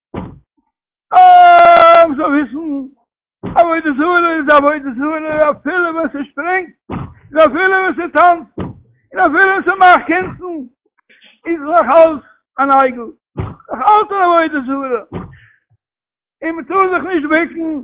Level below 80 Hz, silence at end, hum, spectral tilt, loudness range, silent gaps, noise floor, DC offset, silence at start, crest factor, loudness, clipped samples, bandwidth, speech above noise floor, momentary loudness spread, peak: -46 dBFS; 0 s; none; -8.5 dB/octave; 7 LU; none; under -90 dBFS; under 0.1%; 0.15 s; 12 dB; -11 LUFS; under 0.1%; 4 kHz; over 77 dB; 20 LU; 0 dBFS